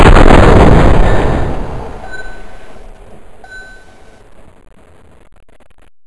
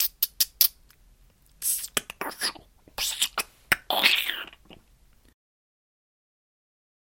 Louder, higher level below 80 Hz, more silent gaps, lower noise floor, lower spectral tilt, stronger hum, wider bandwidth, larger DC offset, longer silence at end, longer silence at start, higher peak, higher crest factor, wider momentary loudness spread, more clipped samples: first, -8 LUFS vs -25 LUFS; first, -14 dBFS vs -58 dBFS; neither; second, -39 dBFS vs -59 dBFS; first, -7 dB/octave vs 1 dB/octave; neither; second, 10.5 kHz vs 17 kHz; neither; second, 0 s vs 2.35 s; about the same, 0 s vs 0 s; about the same, 0 dBFS vs -2 dBFS; second, 10 dB vs 30 dB; first, 27 LU vs 13 LU; first, 3% vs under 0.1%